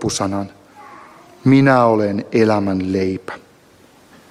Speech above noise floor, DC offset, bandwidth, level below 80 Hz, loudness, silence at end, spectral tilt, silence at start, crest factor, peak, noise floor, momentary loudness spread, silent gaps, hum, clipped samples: 33 dB; under 0.1%; 12 kHz; -54 dBFS; -16 LUFS; 0.9 s; -6 dB/octave; 0 s; 16 dB; -2 dBFS; -49 dBFS; 18 LU; none; none; under 0.1%